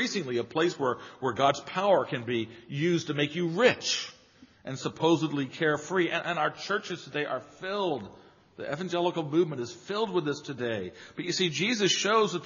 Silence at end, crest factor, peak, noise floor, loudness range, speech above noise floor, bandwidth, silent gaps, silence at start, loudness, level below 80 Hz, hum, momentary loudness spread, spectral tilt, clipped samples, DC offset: 0 s; 20 dB; -8 dBFS; -57 dBFS; 4 LU; 29 dB; 7.4 kHz; none; 0 s; -29 LUFS; -72 dBFS; none; 11 LU; -3.5 dB/octave; under 0.1%; under 0.1%